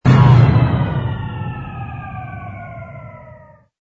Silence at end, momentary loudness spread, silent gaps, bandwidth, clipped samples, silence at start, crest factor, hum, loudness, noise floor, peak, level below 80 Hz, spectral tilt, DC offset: 0.55 s; 23 LU; none; 6.2 kHz; under 0.1%; 0.05 s; 16 dB; none; -14 LUFS; -43 dBFS; 0 dBFS; -34 dBFS; -9 dB/octave; under 0.1%